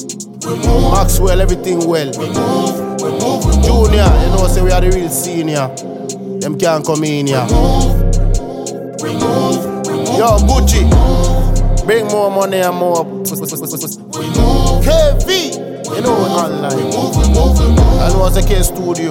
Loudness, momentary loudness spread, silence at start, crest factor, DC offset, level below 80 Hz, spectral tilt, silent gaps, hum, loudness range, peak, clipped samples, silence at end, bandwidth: -14 LUFS; 10 LU; 0 s; 12 dB; under 0.1%; -14 dBFS; -5.5 dB/octave; none; none; 3 LU; 0 dBFS; under 0.1%; 0 s; 16.5 kHz